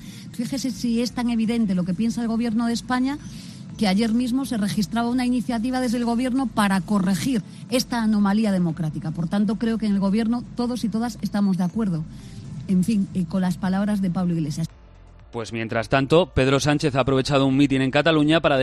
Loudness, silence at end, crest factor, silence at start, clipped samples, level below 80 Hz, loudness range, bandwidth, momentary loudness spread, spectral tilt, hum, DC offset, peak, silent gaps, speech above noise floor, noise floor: -22 LUFS; 0 s; 16 dB; 0 s; under 0.1%; -46 dBFS; 3 LU; 13 kHz; 9 LU; -6 dB/octave; none; under 0.1%; -6 dBFS; none; 25 dB; -46 dBFS